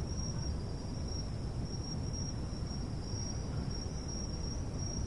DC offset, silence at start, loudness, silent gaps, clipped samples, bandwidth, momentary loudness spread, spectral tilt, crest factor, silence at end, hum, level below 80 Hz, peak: 0.2%; 0 s; -40 LUFS; none; under 0.1%; 11.5 kHz; 2 LU; -5.5 dB/octave; 12 dB; 0 s; none; -42 dBFS; -24 dBFS